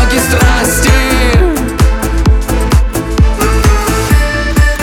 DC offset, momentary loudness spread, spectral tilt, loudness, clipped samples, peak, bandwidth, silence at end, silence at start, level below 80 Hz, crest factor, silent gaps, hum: under 0.1%; 3 LU; -5 dB/octave; -11 LUFS; under 0.1%; 0 dBFS; 17.5 kHz; 0 s; 0 s; -12 dBFS; 8 dB; none; none